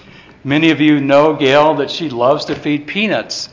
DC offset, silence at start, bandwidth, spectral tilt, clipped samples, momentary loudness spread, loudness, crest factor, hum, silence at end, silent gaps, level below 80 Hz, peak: under 0.1%; 0.45 s; 7.6 kHz; -5.5 dB/octave; under 0.1%; 8 LU; -13 LUFS; 14 dB; none; 0.05 s; none; -52 dBFS; 0 dBFS